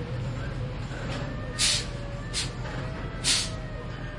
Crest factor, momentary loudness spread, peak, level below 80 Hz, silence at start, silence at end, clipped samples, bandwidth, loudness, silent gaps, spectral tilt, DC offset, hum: 20 dB; 12 LU; -10 dBFS; -40 dBFS; 0 s; 0 s; under 0.1%; 11.5 kHz; -29 LUFS; none; -3 dB/octave; under 0.1%; none